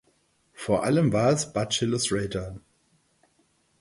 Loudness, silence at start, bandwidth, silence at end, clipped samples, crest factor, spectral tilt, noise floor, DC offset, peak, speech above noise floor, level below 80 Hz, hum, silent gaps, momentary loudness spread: -25 LUFS; 0.6 s; 11.5 kHz; 1.2 s; under 0.1%; 18 dB; -5 dB/octave; -67 dBFS; under 0.1%; -10 dBFS; 43 dB; -54 dBFS; none; none; 15 LU